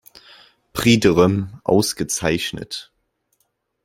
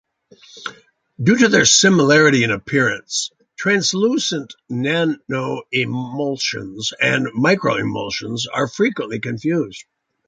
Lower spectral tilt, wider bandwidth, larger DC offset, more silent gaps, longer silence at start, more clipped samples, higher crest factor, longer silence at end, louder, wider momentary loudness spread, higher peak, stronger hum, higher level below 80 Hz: about the same, -4.5 dB/octave vs -3.5 dB/octave; first, 16.5 kHz vs 10 kHz; neither; neither; first, 0.75 s vs 0.55 s; neither; about the same, 20 dB vs 18 dB; first, 1 s vs 0.45 s; about the same, -18 LUFS vs -17 LUFS; first, 16 LU vs 13 LU; about the same, -2 dBFS vs -2 dBFS; neither; first, -48 dBFS vs -58 dBFS